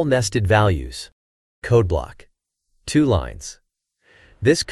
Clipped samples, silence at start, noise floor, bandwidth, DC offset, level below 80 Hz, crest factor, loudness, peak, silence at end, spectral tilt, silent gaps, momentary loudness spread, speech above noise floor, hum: under 0.1%; 0 s; -68 dBFS; 12.5 kHz; under 0.1%; -38 dBFS; 18 dB; -19 LUFS; -2 dBFS; 0 s; -5.5 dB/octave; 1.12-1.62 s; 19 LU; 50 dB; none